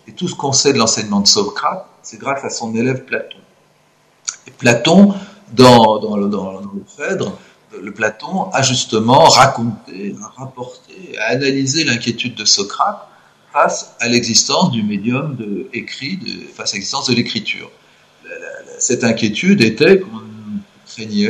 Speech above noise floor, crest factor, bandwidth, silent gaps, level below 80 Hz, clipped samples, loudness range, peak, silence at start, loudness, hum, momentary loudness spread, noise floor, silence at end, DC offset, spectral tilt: 39 dB; 16 dB; 14 kHz; none; -54 dBFS; 0.1%; 7 LU; 0 dBFS; 0.1 s; -14 LUFS; none; 20 LU; -54 dBFS; 0 s; under 0.1%; -3.5 dB/octave